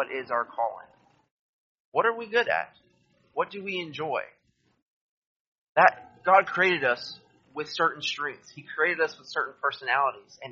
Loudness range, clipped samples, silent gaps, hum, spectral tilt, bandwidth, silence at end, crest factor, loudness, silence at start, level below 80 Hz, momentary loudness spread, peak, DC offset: 6 LU; under 0.1%; 1.31-1.92 s, 4.82-5.52 s, 5.58-5.75 s; none; -1 dB/octave; 7.4 kHz; 0 s; 24 dB; -26 LUFS; 0 s; -76 dBFS; 17 LU; -4 dBFS; under 0.1%